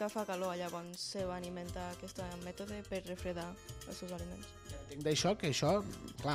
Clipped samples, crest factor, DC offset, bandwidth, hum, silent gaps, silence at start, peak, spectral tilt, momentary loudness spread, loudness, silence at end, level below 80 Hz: under 0.1%; 18 dB; under 0.1%; 15.5 kHz; none; none; 0 s; -22 dBFS; -4.5 dB/octave; 14 LU; -40 LUFS; 0 s; -58 dBFS